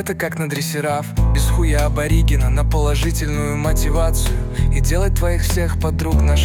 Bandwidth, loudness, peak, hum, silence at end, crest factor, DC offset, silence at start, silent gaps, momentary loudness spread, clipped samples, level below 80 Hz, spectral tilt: 18 kHz; -19 LUFS; -4 dBFS; none; 0 s; 12 dB; under 0.1%; 0 s; none; 4 LU; under 0.1%; -18 dBFS; -5.5 dB/octave